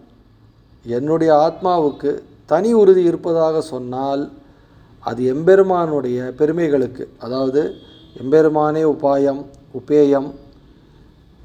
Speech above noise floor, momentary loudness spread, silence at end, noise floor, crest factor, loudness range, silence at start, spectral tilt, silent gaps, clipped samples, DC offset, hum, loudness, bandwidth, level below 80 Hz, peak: 33 dB; 15 LU; 1.05 s; -50 dBFS; 16 dB; 2 LU; 0.85 s; -7.5 dB/octave; none; under 0.1%; under 0.1%; none; -17 LUFS; 9.2 kHz; -52 dBFS; 0 dBFS